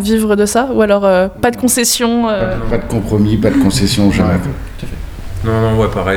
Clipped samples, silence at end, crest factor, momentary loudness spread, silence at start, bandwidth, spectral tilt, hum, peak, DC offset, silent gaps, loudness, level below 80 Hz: under 0.1%; 0 s; 12 dB; 13 LU; 0 s; 19.5 kHz; -5 dB/octave; none; 0 dBFS; under 0.1%; none; -13 LUFS; -26 dBFS